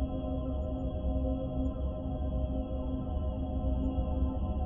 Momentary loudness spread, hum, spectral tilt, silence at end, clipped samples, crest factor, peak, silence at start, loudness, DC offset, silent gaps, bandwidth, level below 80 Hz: 3 LU; none; -11.5 dB/octave; 0 s; under 0.1%; 12 dB; -20 dBFS; 0 s; -35 LUFS; under 0.1%; none; 3.5 kHz; -34 dBFS